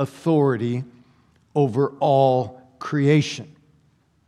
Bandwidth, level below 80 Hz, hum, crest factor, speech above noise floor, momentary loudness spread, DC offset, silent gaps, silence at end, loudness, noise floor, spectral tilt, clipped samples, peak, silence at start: 11 kHz; -68 dBFS; none; 16 dB; 41 dB; 15 LU; under 0.1%; none; 0.8 s; -21 LUFS; -61 dBFS; -7 dB/octave; under 0.1%; -6 dBFS; 0 s